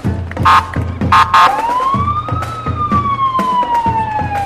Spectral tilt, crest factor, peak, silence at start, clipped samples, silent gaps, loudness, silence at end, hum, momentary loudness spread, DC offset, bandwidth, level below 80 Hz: -5.5 dB/octave; 12 dB; -2 dBFS; 0 s; under 0.1%; none; -13 LUFS; 0 s; none; 10 LU; under 0.1%; 15.5 kHz; -32 dBFS